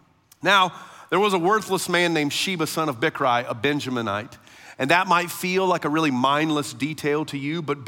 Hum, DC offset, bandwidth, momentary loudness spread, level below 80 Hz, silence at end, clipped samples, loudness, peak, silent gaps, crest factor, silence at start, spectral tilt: none; under 0.1%; 17 kHz; 9 LU; -68 dBFS; 0 s; under 0.1%; -22 LUFS; -4 dBFS; none; 20 dB; 0.4 s; -4 dB/octave